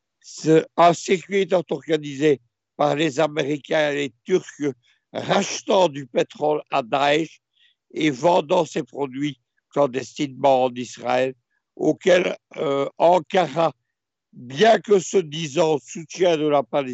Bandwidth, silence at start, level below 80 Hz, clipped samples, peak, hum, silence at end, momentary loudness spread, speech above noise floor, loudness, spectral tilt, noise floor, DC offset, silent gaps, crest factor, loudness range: 8.2 kHz; 0.25 s; -74 dBFS; under 0.1%; -2 dBFS; none; 0 s; 11 LU; 62 dB; -21 LUFS; -5 dB/octave; -82 dBFS; under 0.1%; none; 18 dB; 3 LU